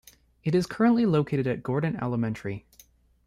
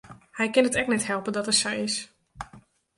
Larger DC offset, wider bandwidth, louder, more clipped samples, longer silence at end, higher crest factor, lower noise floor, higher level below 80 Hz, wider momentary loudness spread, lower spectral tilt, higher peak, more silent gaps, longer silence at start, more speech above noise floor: neither; first, 14.5 kHz vs 11.5 kHz; about the same, -26 LUFS vs -25 LUFS; neither; first, 0.65 s vs 0.4 s; about the same, 16 dB vs 20 dB; first, -58 dBFS vs -54 dBFS; about the same, -58 dBFS vs -58 dBFS; second, 12 LU vs 20 LU; first, -8 dB/octave vs -2.5 dB/octave; about the same, -10 dBFS vs -8 dBFS; neither; first, 0.45 s vs 0.05 s; first, 33 dB vs 29 dB